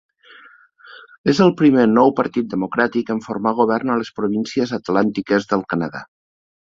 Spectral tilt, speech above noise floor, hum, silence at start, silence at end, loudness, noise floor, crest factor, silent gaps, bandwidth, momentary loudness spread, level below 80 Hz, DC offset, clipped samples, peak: -6.5 dB/octave; 30 dB; none; 0.9 s; 0.7 s; -18 LUFS; -47 dBFS; 18 dB; 1.18-1.24 s; 7.6 kHz; 10 LU; -58 dBFS; under 0.1%; under 0.1%; -2 dBFS